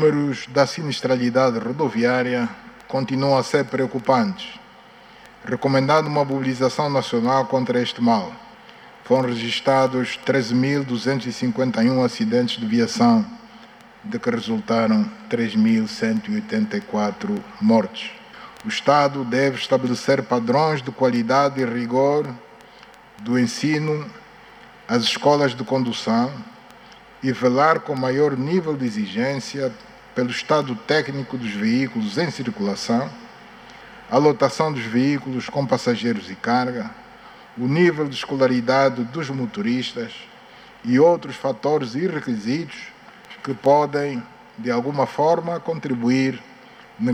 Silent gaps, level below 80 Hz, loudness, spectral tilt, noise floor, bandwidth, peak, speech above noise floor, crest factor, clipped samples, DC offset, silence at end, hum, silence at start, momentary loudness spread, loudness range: none; -62 dBFS; -21 LUFS; -6 dB/octave; -46 dBFS; 11 kHz; -2 dBFS; 26 dB; 18 dB; under 0.1%; under 0.1%; 0 s; none; 0 s; 13 LU; 3 LU